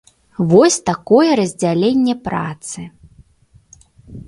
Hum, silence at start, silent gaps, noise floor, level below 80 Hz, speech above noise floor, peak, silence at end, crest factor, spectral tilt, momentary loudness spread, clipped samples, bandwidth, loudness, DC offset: none; 0.4 s; none; -52 dBFS; -50 dBFS; 37 dB; 0 dBFS; 0.05 s; 16 dB; -5.5 dB/octave; 18 LU; under 0.1%; 11.5 kHz; -15 LUFS; under 0.1%